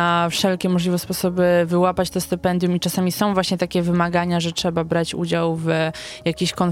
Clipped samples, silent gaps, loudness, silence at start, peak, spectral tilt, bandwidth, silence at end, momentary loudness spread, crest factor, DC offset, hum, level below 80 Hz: under 0.1%; none; -20 LUFS; 0 s; -4 dBFS; -5.5 dB/octave; 16.5 kHz; 0 s; 5 LU; 16 dB; under 0.1%; none; -48 dBFS